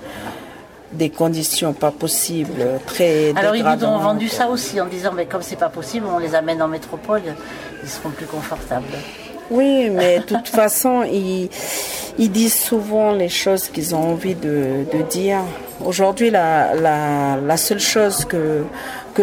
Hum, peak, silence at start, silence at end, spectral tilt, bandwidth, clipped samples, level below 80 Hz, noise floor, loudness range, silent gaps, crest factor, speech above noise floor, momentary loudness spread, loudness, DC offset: none; -2 dBFS; 0 s; 0 s; -4 dB/octave; 19 kHz; under 0.1%; -50 dBFS; -39 dBFS; 6 LU; none; 16 dB; 20 dB; 13 LU; -18 LUFS; under 0.1%